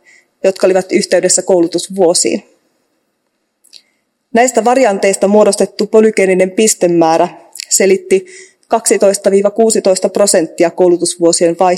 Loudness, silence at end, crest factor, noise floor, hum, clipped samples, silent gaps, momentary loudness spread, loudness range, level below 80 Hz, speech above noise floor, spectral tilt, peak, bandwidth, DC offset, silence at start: -11 LUFS; 0 s; 12 dB; -66 dBFS; none; 0.6%; none; 5 LU; 4 LU; -62 dBFS; 55 dB; -3.5 dB/octave; 0 dBFS; 16.5 kHz; under 0.1%; 0.45 s